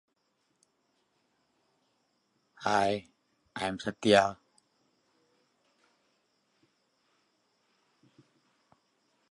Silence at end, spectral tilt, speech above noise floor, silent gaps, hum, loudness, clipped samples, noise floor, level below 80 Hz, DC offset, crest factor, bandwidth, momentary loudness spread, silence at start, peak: 4.95 s; -4.5 dB/octave; 49 dB; none; none; -29 LUFS; under 0.1%; -77 dBFS; -70 dBFS; under 0.1%; 28 dB; 11.5 kHz; 13 LU; 2.6 s; -8 dBFS